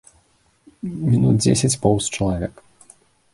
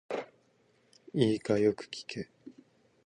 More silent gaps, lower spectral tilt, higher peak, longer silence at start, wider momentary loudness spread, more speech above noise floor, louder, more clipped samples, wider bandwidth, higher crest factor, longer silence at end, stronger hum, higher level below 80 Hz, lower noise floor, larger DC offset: neither; about the same, -5.5 dB/octave vs -6.5 dB/octave; first, -2 dBFS vs -12 dBFS; first, 0.85 s vs 0.1 s; about the same, 15 LU vs 16 LU; about the same, 42 dB vs 39 dB; first, -19 LUFS vs -32 LUFS; neither; first, 11.5 kHz vs 10 kHz; about the same, 18 dB vs 22 dB; first, 0.85 s vs 0.55 s; neither; first, -42 dBFS vs -70 dBFS; second, -60 dBFS vs -69 dBFS; neither